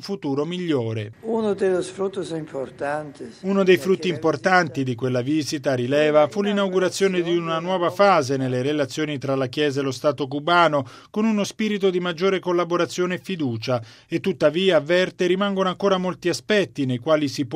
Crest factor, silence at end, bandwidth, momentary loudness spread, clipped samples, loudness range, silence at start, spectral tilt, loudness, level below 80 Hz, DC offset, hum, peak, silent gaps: 18 dB; 0 s; 15 kHz; 9 LU; under 0.1%; 3 LU; 0 s; -5.5 dB/octave; -22 LUFS; -64 dBFS; under 0.1%; none; -2 dBFS; none